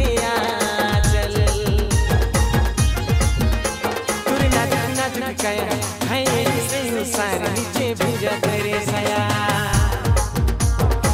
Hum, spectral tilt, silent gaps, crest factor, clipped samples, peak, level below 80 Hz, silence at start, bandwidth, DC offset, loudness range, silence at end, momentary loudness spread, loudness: none; -4.5 dB/octave; none; 14 dB; under 0.1%; -4 dBFS; -26 dBFS; 0 s; 16 kHz; under 0.1%; 2 LU; 0 s; 4 LU; -20 LUFS